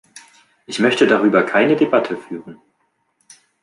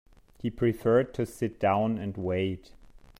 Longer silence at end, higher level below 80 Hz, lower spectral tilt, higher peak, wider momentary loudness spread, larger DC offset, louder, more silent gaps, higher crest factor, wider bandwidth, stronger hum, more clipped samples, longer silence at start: first, 1.1 s vs 0.6 s; second, -66 dBFS vs -54 dBFS; second, -5 dB/octave vs -7.5 dB/octave; first, -2 dBFS vs -12 dBFS; first, 15 LU vs 10 LU; neither; first, -16 LUFS vs -29 LUFS; neither; about the same, 16 dB vs 18 dB; second, 11.5 kHz vs 16 kHz; neither; neither; first, 0.7 s vs 0.45 s